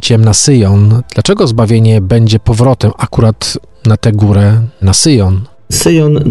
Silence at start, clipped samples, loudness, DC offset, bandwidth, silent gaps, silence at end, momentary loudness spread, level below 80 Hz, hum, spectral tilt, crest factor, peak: 0 s; under 0.1%; -9 LUFS; under 0.1%; 12.5 kHz; none; 0 s; 6 LU; -24 dBFS; none; -5.5 dB/octave; 8 dB; 0 dBFS